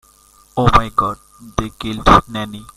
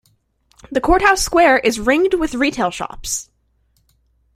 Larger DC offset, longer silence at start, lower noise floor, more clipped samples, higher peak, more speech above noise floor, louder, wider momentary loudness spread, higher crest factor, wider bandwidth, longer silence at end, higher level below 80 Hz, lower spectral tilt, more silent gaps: neither; second, 0.55 s vs 0.7 s; second, -50 dBFS vs -62 dBFS; first, 0.1% vs under 0.1%; about the same, 0 dBFS vs -2 dBFS; second, 34 dB vs 46 dB; about the same, -16 LUFS vs -16 LUFS; first, 14 LU vs 11 LU; about the same, 16 dB vs 16 dB; about the same, 15.5 kHz vs 16 kHz; second, 0.15 s vs 1.15 s; first, -28 dBFS vs -36 dBFS; first, -5.5 dB/octave vs -3 dB/octave; neither